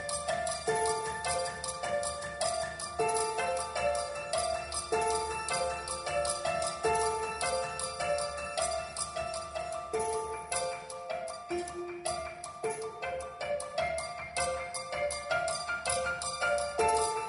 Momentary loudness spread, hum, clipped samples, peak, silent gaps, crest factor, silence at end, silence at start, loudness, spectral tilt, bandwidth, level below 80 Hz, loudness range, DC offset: 7 LU; none; under 0.1%; -16 dBFS; none; 18 dB; 0 s; 0 s; -33 LUFS; -2 dB/octave; 11 kHz; -56 dBFS; 4 LU; under 0.1%